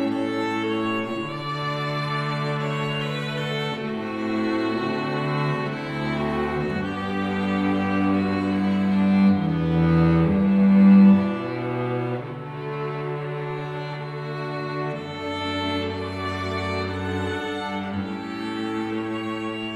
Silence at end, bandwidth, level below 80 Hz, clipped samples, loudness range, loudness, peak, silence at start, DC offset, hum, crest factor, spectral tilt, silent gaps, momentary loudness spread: 0 s; 8.6 kHz; -48 dBFS; under 0.1%; 10 LU; -24 LUFS; -6 dBFS; 0 s; under 0.1%; none; 16 dB; -7.5 dB/octave; none; 11 LU